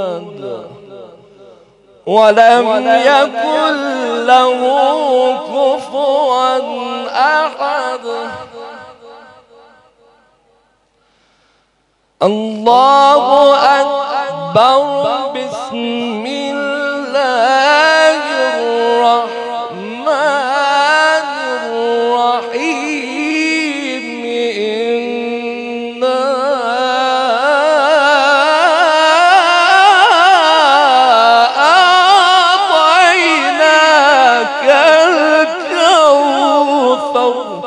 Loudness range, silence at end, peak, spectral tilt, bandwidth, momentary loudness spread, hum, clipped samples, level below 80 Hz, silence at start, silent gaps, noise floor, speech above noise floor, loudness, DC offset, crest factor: 9 LU; 0 s; 0 dBFS; -2.5 dB/octave; 12 kHz; 13 LU; none; 0.3%; -64 dBFS; 0 s; none; -59 dBFS; 48 dB; -11 LUFS; under 0.1%; 12 dB